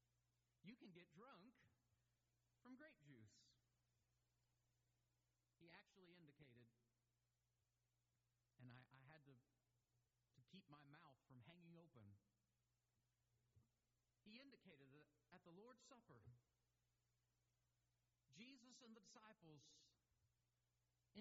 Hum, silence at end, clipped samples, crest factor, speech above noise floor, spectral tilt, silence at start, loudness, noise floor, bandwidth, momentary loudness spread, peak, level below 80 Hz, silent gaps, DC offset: none; 0 s; under 0.1%; 22 dB; over 21 dB; -4.5 dB/octave; 0 s; -68 LUFS; under -90 dBFS; 7.4 kHz; 3 LU; -50 dBFS; under -90 dBFS; none; under 0.1%